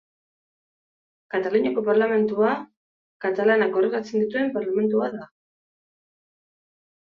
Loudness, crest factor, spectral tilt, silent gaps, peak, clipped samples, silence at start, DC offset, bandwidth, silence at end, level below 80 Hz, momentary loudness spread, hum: -23 LUFS; 18 dB; -7 dB/octave; 2.77-3.20 s; -8 dBFS; under 0.1%; 1.35 s; under 0.1%; 6.6 kHz; 1.75 s; -70 dBFS; 10 LU; none